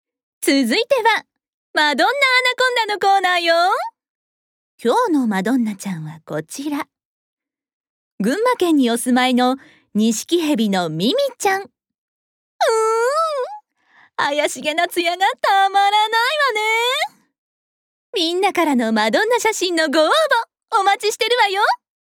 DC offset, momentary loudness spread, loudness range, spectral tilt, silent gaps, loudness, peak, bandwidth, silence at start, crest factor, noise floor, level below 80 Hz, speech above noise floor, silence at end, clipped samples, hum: under 0.1%; 11 LU; 6 LU; -3 dB/octave; 1.48-1.74 s, 4.09-4.78 s, 7.05-7.37 s, 7.73-8.18 s, 11.98-12.59 s, 17.38-18.13 s; -17 LUFS; -4 dBFS; 19.5 kHz; 0.4 s; 14 dB; -54 dBFS; -78 dBFS; 37 dB; 0.25 s; under 0.1%; none